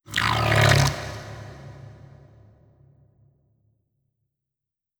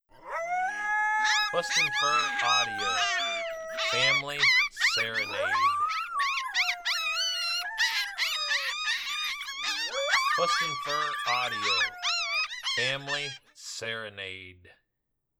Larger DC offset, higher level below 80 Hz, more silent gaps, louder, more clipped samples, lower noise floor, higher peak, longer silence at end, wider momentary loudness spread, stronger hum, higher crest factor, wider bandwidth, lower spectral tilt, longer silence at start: neither; first, -42 dBFS vs -66 dBFS; neither; first, -20 LUFS vs -27 LUFS; neither; first, -88 dBFS vs -81 dBFS; first, -4 dBFS vs -12 dBFS; first, 3.1 s vs 0.7 s; first, 25 LU vs 10 LU; neither; about the same, 22 dB vs 18 dB; about the same, over 20 kHz vs over 20 kHz; first, -4.5 dB/octave vs 0 dB/octave; about the same, 0.1 s vs 0.2 s